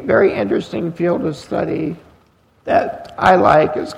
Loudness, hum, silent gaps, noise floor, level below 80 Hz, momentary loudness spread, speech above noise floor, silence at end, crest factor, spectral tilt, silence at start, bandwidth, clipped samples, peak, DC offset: -17 LUFS; none; none; -54 dBFS; -48 dBFS; 14 LU; 38 dB; 0 s; 16 dB; -7 dB/octave; 0 s; 12 kHz; under 0.1%; 0 dBFS; under 0.1%